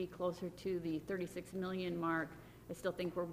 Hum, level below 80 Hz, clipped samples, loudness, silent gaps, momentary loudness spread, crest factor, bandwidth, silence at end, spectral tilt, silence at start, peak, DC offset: none; -66 dBFS; under 0.1%; -41 LUFS; none; 6 LU; 16 dB; 15.5 kHz; 0 s; -6.5 dB/octave; 0 s; -26 dBFS; under 0.1%